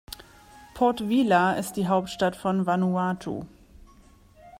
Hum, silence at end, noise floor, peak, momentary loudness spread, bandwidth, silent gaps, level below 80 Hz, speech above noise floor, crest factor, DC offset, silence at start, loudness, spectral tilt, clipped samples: none; 0 s; -54 dBFS; -8 dBFS; 15 LU; 16 kHz; none; -56 dBFS; 30 dB; 18 dB; under 0.1%; 0.1 s; -25 LUFS; -6 dB/octave; under 0.1%